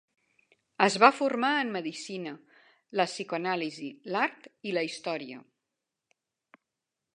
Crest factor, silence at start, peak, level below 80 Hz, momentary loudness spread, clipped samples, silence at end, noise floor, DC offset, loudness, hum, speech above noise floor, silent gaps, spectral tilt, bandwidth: 28 dB; 0.8 s; -2 dBFS; -82 dBFS; 19 LU; under 0.1%; 1.75 s; -87 dBFS; under 0.1%; -29 LUFS; none; 58 dB; none; -4 dB/octave; 11 kHz